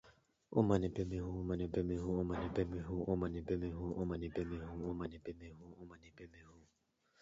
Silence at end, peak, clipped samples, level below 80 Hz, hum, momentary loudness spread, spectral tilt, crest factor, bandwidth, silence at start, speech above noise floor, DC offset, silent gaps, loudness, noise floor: 0.6 s; -20 dBFS; under 0.1%; -54 dBFS; none; 20 LU; -8.5 dB/octave; 20 dB; 7.6 kHz; 0.05 s; 39 dB; under 0.1%; none; -40 LUFS; -79 dBFS